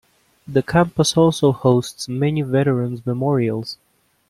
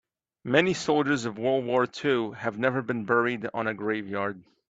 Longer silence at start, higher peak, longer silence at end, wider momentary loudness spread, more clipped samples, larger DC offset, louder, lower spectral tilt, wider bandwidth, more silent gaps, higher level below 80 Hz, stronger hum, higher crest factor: about the same, 0.5 s vs 0.45 s; first, -2 dBFS vs -8 dBFS; first, 0.55 s vs 0.3 s; about the same, 10 LU vs 8 LU; neither; neither; first, -19 LUFS vs -27 LUFS; about the same, -6 dB/octave vs -5.5 dB/octave; first, 14 kHz vs 8.8 kHz; neither; first, -50 dBFS vs -68 dBFS; neither; about the same, 16 dB vs 20 dB